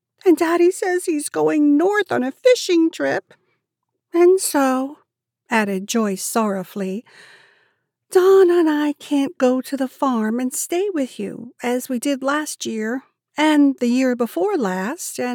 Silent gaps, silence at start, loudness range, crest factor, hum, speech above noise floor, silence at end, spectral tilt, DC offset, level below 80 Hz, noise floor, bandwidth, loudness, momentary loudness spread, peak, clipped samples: none; 0.25 s; 4 LU; 16 dB; none; 60 dB; 0 s; -4 dB/octave; under 0.1%; -86 dBFS; -78 dBFS; 19 kHz; -19 LUFS; 11 LU; -4 dBFS; under 0.1%